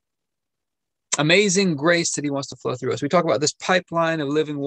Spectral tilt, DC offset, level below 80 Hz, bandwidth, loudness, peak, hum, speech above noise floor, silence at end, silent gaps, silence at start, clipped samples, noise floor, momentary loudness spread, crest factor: -3.5 dB/octave; under 0.1%; -68 dBFS; 10 kHz; -20 LUFS; -2 dBFS; none; 64 dB; 0 s; none; 1.1 s; under 0.1%; -85 dBFS; 10 LU; 20 dB